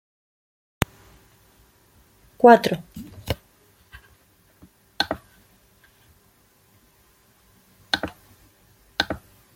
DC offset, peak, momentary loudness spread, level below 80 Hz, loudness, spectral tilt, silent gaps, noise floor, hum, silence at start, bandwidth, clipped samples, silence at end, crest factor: under 0.1%; 0 dBFS; 21 LU; -52 dBFS; -22 LUFS; -5 dB/octave; none; -59 dBFS; none; 2.45 s; 16.5 kHz; under 0.1%; 0.4 s; 26 dB